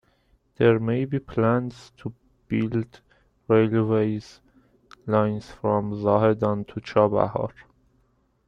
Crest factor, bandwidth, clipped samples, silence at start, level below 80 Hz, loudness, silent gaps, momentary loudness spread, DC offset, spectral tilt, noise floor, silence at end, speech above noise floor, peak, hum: 20 dB; 7.6 kHz; under 0.1%; 0.6 s; -56 dBFS; -24 LUFS; none; 15 LU; under 0.1%; -9 dB/octave; -66 dBFS; 0.85 s; 43 dB; -4 dBFS; none